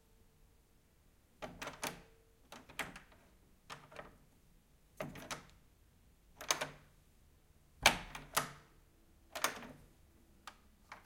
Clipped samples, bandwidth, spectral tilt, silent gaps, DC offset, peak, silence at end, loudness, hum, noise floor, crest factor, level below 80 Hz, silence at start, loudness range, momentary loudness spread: under 0.1%; 16.5 kHz; -1 dB/octave; none; under 0.1%; -8 dBFS; 0.05 s; -39 LUFS; none; -69 dBFS; 38 dB; -64 dBFS; 1.4 s; 14 LU; 26 LU